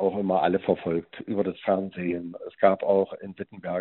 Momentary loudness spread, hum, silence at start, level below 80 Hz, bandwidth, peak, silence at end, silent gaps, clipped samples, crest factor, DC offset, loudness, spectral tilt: 12 LU; none; 0 s; -64 dBFS; 4.2 kHz; -6 dBFS; 0 s; none; under 0.1%; 20 dB; under 0.1%; -26 LUFS; -6 dB/octave